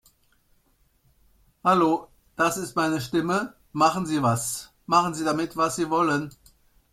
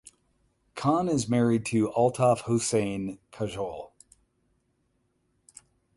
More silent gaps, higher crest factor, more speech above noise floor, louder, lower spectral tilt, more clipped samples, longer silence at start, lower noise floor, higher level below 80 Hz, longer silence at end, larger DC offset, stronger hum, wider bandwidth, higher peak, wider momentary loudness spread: neither; about the same, 20 dB vs 18 dB; second, 41 dB vs 47 dB; first, -24 LUFS vs -27 LUFS; second, -4.5 dB/octave vs -6 dB/octave; neither; first, 1.65 s vs 0.05 s; second, -65 dBFS vs -73 dBFS; about the same, -60 dBFS vs -60 dBFS; second, 0.65 s vs 2.1 s; neither; neither; first, 15.5 kHz vs 11.5 kHz; first, -6 dBFS vs -10 dBFS; second, 8 LU vs 13 LU